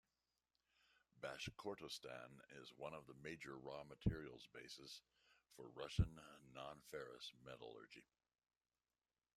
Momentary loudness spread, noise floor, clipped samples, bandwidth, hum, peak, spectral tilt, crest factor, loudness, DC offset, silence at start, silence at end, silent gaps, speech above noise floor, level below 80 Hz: 15 LU; under -90 dBFS; under 0.1%; 14 kHz; none; -26 dBFS; -5.5 dB/octave; 28 dB; -52 LUFS; under 0.1%; 1.15 s; 1.35 s; none; over 39 dB; -62 dBFS